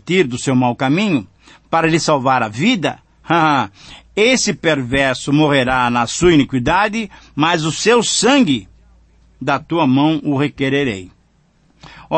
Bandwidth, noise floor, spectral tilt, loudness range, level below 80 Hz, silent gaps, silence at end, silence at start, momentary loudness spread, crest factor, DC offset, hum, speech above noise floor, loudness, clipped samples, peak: 8.8 kHz; -55 dBFS; -4.5 dB/octave; 3 LU; -44 dBFS; none; 0 s; 0.05 s; 8 LU; 14 dB; under 0.1%; none; 40 dB; -15 LUFS; under 0.1%; -2 dBFS